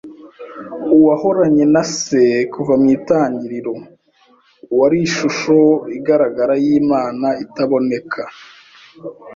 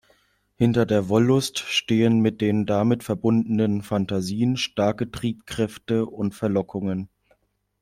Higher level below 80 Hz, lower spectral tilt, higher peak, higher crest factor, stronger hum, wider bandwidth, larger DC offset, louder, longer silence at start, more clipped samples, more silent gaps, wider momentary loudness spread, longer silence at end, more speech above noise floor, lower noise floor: about the same, -56 dBFS vs -56 dBFS; about the same, -5.5 dB/octave vs -6 dB/octave; first, -2 dBFS vs -6 dBFS; about the same, 14 dB vs 16 dB; neither; second, 7.8 kHz vs 15 kHz; neither; first, -15 LUFS vs -23 LUFS; second, 0.05 s vs 0.6 s; neither; neither; first, 16 LU vs 8 LU; second, 0 s vs 0.75 s; second, 39 dB vs 44 dB; second, -54 dBFS vs -66 dBFS